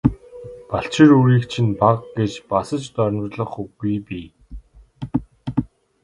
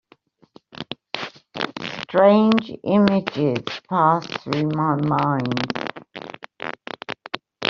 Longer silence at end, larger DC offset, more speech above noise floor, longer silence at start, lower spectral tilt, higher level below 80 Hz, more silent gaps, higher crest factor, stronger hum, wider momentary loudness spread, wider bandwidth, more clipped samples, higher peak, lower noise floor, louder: first, 0.4 s vs 0 s; neither; second, 21 dB vs 37 dB; second, 0.05 s vs 0.8 s; first, -7.5 dB/octave vs -5 dB/octave; first, -44 dBFS vs -60 dBFS; neither; about the same, 20 dB vs 20 dB; neither; first, 22 LU vs 17 LU; first, 11 kHz vs 7 kHz; neither; about the same, 0 dBFS vs -2 dBFS; second, -39 dBFS vs -56 dBFS; about the same, -20 LUFS vs -21 LUFS